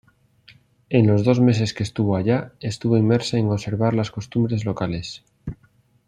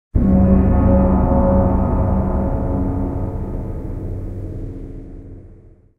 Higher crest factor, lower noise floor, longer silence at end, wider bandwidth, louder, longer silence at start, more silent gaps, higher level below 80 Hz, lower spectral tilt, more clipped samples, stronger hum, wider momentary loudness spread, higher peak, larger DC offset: about the same, 18 dB vs 14 dB; first, -59 dBFS vs -44 dBFS; about the same, 0.55 s vs 0.45 s; first, 10.5 kHz vs 2.7 kHz; second, -21 LUFS vs -18 LUFS; first, 0.9 s vs 0.15 s; neither; second, -52 dBFS vs -22 dBFS; second, -7 dB/octave vs -12.5 dB/octave; neither; neither; second, 14 LU vs 18 LU; about the same, -2 dBFS vs -2 dBFS; neither